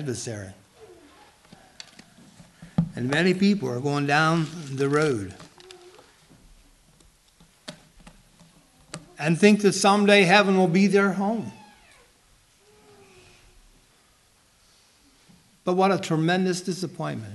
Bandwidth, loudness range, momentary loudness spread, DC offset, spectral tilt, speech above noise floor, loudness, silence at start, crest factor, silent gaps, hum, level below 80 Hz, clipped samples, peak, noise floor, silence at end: 12.5 kHz; 12 LU; 25 LU; under 0.1%; -5.5 dB/octave; 39 dB; -22 LUFS; 0 s; 22 dB; none; none; -60 dBFS; under 0.1%; -4 dBFS; -61 dBFS; 0 s